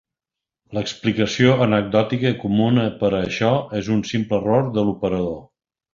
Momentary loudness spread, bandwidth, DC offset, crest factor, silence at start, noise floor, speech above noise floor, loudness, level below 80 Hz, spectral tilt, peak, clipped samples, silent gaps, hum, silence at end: 8 LU; 7.4 kHz; under 0.1%; 18 dB; 0.7 s; -87 dBFS; 68 dB; -20 LUFS; -50 dBFS; -6.5 dB/octave; -2 dBFS; under 0.1%; none; none; 0.5 s